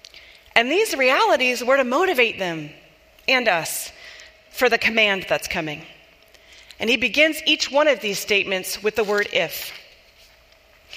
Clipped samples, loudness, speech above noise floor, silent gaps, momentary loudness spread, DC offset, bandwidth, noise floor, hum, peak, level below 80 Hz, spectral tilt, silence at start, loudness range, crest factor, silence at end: under 0.1%; -19 LUFS; 33 dB; none; 14 LU; under 0.1%; 15.5 kHz; -53 dBFS; none; 0 dBFS; -58 dBFS; -2.5 dB/octave; 0.55 s; 3 LU; 22 dB; 0 s